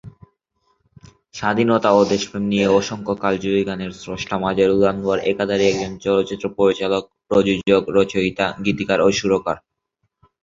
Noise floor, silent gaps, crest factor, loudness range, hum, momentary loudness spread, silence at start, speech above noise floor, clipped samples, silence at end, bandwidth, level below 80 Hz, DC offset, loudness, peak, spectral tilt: -73 dBFS; none; 18 dB; 1 LU; none; 9 LU; 0.05 s; 55 dB; under 0.1%; 0.85 s; 7.8 kHz; -50 dBFS; under 0.1%; -19 LUFS; -2 dBFS; -5.5 dB/octave